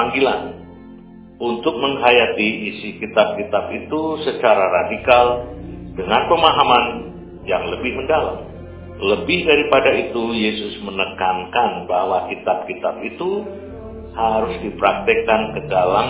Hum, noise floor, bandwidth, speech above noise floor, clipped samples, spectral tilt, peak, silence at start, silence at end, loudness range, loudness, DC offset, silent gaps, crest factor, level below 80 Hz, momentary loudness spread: none; -40 dBFS; 4 kHz; 22 dB; under 0.1%; -8.5 dB/octave; 0 dBFS; 0 s; 0 s; 5 LU; -18 LUFS; under 0.1%; none; 18 dB; -42 dBFS; 18 LU